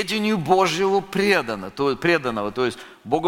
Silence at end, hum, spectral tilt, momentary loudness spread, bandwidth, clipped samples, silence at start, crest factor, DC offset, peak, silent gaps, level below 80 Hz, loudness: 0 s; none; -5 dB/octave; 7 LU; 17 kHz; under 0.1%; 0 s; 18 dB; under 0.1%; -4 dBFS; none; -52 dBFS; -21 LUFS